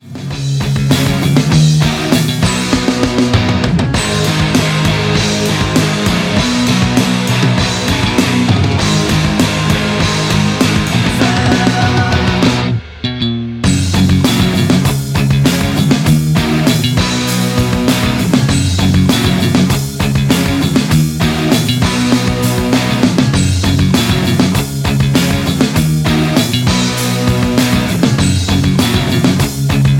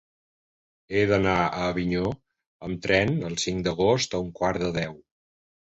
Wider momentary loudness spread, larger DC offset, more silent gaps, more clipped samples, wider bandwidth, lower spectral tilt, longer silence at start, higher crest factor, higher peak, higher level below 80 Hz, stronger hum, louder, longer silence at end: second, 3 LU vs 10 LU; neither; second, none vs 2.47-2.60 s; neither; first, 17 kHz vs 8.2 kHz; about the same, -5 dB/octave vs -5 dB/octave; second, 0.05 s vs 0.9 s; second, 12 dB vs 20 dB; first, 0 dBFS vs -6 dBFS; first, -28 dBFS vs -48 dBFS; neither; first, -12 LUFS vs -25 LUFS; second, 0 s vs 0.8 s